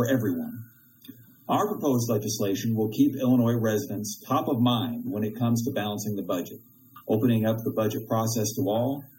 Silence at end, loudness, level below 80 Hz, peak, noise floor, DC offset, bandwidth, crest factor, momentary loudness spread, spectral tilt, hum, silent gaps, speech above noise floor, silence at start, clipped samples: 0.15 s; -26 LUFS; -68 dBFS; -10 dBFS; -50 dBFS; under 0.1%; 16.5 kHz; 16 dB; 9 LU; -6 dB/octave; none; none; 24 dB; 0 s; under 0.1%